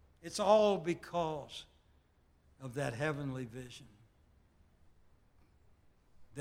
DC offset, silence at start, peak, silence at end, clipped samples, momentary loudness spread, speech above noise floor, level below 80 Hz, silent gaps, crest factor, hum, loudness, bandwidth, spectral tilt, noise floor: under 0.1%; 0.25 s; -14 dBFS; 0 s; under 0.1%; 23 LU; 35 dB; -66 dBFS; none; 24 dB; none; -35 LUFS; 15.5 kHz; -5.5 dB/octave; -69 dBFS